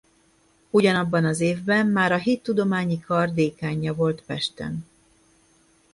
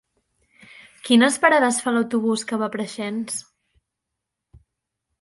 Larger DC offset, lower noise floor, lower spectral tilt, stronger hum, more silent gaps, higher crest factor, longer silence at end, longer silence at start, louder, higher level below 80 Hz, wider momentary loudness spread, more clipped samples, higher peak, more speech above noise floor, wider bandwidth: neither; second, -61 dBFS vs -82 dBFS; first, -6 dB/octave vs -3 dB/octave; neither; neither; about the same, 18 dB vs 22 dB; second, 1.1 s vs 1.8 s; second, 0.75 s vs 1.05 s; second, -23 LUFS vs -20 LUFS; first, -58 dBFS vs -66 dBFS; second, 8 LU vs 13 LU; neither; second, -6 dBFS vs -2 dBFS; second, 39 dB vs 62 dB; about the same, 11.5 kHz vs 11.5 kHz